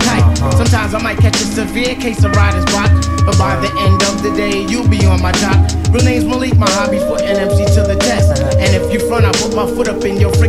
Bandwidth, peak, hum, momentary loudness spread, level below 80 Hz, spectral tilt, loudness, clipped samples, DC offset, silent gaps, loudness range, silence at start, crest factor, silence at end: 13.5 kHz; 0 dBFS; none; 4 LU; -22 dBFS; -5.5 dB/octave; -13 LUFS; under 0.1%; under 0.1%; none; 1 LU; 0 s; 12 dB; 0 s